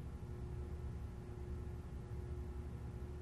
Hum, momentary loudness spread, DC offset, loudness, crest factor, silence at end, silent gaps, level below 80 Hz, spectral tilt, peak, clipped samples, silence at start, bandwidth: none; 2 LU; under 0.1%; -48 LUFS; 10 dB; 0 s; none; -48 dBFS; -8 dB/octave; -36 dBFS; under 0.1%; 0 s; 13 kHz